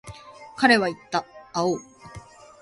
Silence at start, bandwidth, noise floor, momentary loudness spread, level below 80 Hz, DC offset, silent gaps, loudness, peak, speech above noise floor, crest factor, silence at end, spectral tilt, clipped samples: 0.05 s; 11.5 kHz; -45 dBFS; 25 LU; -58 dBFS; under 0.1%; none; -23 LUFS; -4 dBFS; 23 dB; 22 dB; 0.45 s; -4 dB/octave; under 0.1%